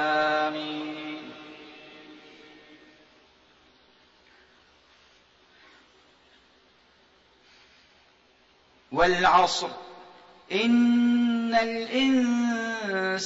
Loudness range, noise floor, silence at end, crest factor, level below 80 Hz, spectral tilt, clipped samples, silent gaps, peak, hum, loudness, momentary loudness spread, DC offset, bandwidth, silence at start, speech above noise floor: 18 LU; -61 dBFS; 0 s; 22 dB; -60 dBFS; -4 dB/octave; under 0.1%; none; -8 dBFS; none; -24 LUFS; 25 LU; under 0.1%; 8 kHz; 0 s; 38 dB